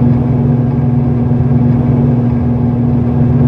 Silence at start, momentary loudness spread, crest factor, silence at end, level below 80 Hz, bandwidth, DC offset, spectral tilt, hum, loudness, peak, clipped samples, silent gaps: 0 s; 2 LU; 10 dB; 0 s; -26 dBFS; 3.6 kHz; under 0.1%; -12 dB/octave; none; -12 LUFS; 0 dBFS; under 0.1%; none